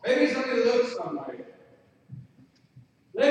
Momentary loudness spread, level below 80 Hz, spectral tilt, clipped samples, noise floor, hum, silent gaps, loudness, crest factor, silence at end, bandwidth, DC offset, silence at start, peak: 24 LU; -76 dBFS; -4.5 dB/octave; under 0.1%; -59 dBFS; none; none; -26 LUFS; 18 dB; 0 s; 9.6 kHz; under 0.1%; 0.05 s; -10 dBFS